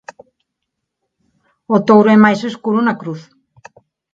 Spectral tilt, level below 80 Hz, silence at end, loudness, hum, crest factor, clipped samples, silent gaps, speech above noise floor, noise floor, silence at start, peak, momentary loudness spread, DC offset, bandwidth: -7.5 dB/octave; -60 dBFS; 0.9 s; -13 LUFS; none; 16 dB; under 0.1%; none; 64 dB; -76 dBFS; 1.7 s; 0 dBFS; 17 LU; under 0.1%; 7.4 kHz